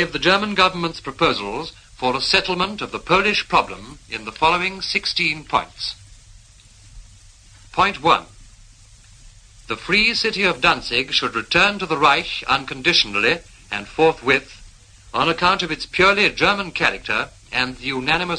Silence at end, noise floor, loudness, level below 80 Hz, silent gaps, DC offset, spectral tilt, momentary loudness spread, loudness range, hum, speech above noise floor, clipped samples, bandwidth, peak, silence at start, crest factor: 0 s; -47 dBFS; -18 LUFS; -46 dBFS; none; under 0.1%; -3.5 dB/octave; 13 LU; 7 LU; none; 28 dB; under 0.1%; 10.5 kHz; 0 dBFS; 0 s; 20 dB